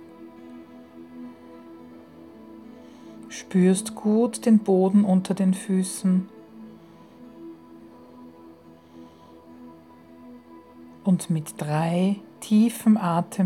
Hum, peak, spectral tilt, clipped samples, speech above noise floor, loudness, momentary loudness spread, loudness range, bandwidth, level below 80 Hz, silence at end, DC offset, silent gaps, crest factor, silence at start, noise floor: none; -8 dBFS; -7 dB/octave; under 0.1%; 27 dB; -22 LUFS; 26 LU; 13 LU; 13.5 kHz; -74 dBFS; 0 s; under 0.1%; none; 16 dB; 0 s; -49 dBFS